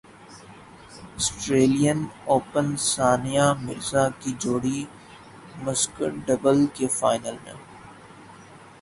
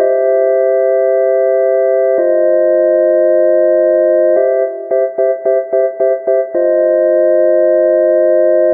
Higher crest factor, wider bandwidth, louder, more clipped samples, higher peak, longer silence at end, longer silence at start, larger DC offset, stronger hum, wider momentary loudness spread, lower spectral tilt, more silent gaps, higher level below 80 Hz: first, 20 dB vs 10 dB; first, 11.5 kHz vs 2.1 kHz; second, -23 LUFS vs -11 LUFS; neither; second, -6 dBFS vs 0 dBFS; first, 0.25 s vs 0 s; first, 0.2 s vs 0 s; neither; neither; first, 22 LU vs 4 LU; second, -4.5 dB/octave vs -12.5 dB/octave; neither; first, -54 dBFS vs -76 dBFS